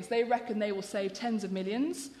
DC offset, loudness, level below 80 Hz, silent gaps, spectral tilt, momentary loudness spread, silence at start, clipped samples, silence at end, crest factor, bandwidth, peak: under 0.1%; -33 LUFS; -74 dBFS; none; -5 dB/octave; 5 LU; 0 s; under 0.1%; 0 s; 16 dB; 13.5 kHz; -16 dBFS